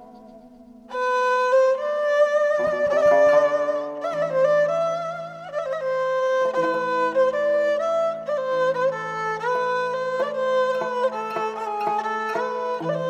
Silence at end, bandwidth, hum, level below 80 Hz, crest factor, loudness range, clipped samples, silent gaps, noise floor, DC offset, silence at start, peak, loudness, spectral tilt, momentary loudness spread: 0 s; 9 kHz; none; -66 dBFS; 16 dB; 4 LU; under 0.1%; none; -46 dBFS; under 0.1%; 0 s; -6 dBFS; -22 LUFS; -4.5 dB/octave; 8 LU